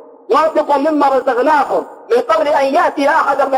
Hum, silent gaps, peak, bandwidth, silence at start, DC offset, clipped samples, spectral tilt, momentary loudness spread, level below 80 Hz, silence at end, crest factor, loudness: none; none; -2 dBFS; 16 kHz; 0.3 s; under 0.1%; under 0.1%; -3.5 dB/octave; 4 LU; -58 dBFS; 0 s; 10 dB; -13 LUFS